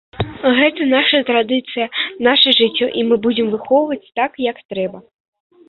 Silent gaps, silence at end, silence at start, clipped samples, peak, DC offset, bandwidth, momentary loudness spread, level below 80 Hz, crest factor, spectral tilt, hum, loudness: 4.65-4.69 s; 0.65 s; 0.15 s; under 0.1%; 0 dBFS; under 0.1%; 4.8 kHz; 12 LU; -50 dBFS; 16 dB; -7 dB/octave; none; -16 LUFS